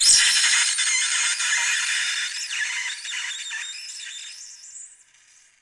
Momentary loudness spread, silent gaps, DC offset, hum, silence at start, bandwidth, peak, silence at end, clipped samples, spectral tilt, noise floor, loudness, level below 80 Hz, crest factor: 21 LU; none; under 0.1%; none; 0 s; 12 kHz; -2 dBFS; 0.75 s; under 0.1%; 5.5 dB/octave; -56 dBFS; -20 LUFS; -68 dBFS; 22 dB